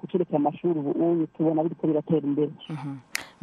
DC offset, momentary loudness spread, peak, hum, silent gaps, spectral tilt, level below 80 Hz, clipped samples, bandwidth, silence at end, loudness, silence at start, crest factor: under 0.1%; 10 LU; -4 dBFS; none; none; -7 dB/octave; -72 dBFS; under 0.1%; 13 kHz; 0.15 s; -26 LUFS; 0.05 s; 22 dB